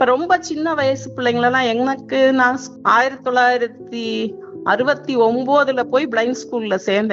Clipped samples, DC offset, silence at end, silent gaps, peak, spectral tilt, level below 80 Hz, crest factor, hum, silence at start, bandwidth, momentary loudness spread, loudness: under 0.1%; under 0.1%; 0 s; none; -2 dBFS; -2.5 dB/octave; -62 dBFS; 16 dB; none; 0 s; 7.8 kHz; 8 LU; -18 LUFS